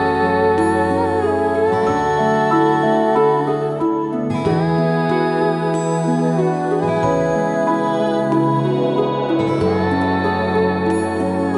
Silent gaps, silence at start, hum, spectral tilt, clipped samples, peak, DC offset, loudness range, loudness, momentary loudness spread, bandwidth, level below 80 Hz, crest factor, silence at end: none; 0 s; none; -7 dB/octave; under 0.1%; -4 dBFS; under 0.1%; 2 LU; -17 LUFS; 4 LU; 11.5 kHz; -48 dBFS; 12 dB; 0 s